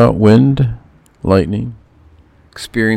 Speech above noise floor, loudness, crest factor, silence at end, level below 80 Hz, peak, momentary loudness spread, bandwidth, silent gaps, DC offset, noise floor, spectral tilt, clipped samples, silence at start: 35 dB; -13 LUFS; 14 dB; 0 s; -36 dBFS; 0 dBFS; 19 LU; 13.5 kHz; none; under 0.1%; -46 dBFS; -8 dB/octave; 0.1%; 0 s